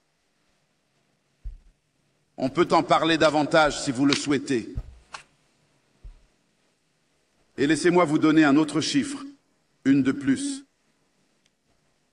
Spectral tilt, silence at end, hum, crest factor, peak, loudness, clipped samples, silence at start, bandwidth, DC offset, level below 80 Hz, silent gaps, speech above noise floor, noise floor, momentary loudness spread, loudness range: -4.5 dB/octave; 1.5 s; none; 24 dB; -2 dBFS; -22 LUFS; under 0.1%; 1.45 s; 10.5 kHz; under 0.1%; -50 dBFS; none; 49 dB; -70 dBFS; 20 LU; 7 LU